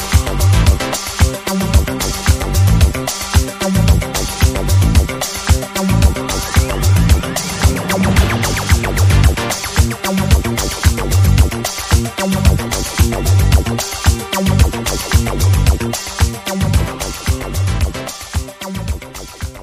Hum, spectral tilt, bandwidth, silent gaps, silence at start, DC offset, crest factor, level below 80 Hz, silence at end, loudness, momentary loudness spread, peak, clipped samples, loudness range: none; -4.5 dB/octave; 15.5 kHz; none; 0 s; under 0.1%; 14 dB; -18 dBFS; 0 s; -15 LUFS; 7 LU; 0 dBFS; under 0.1%; 2 LU